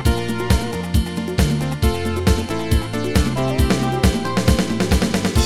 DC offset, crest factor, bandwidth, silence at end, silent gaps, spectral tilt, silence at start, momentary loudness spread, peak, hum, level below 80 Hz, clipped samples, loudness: under 0.1%; 16 dB; 16 kHz; 0 s; none; -5.5 dB/octave; 0 s; 3 LU; -2 dBFS; none; -24 dBFS; under 0.1%; -19 LUFS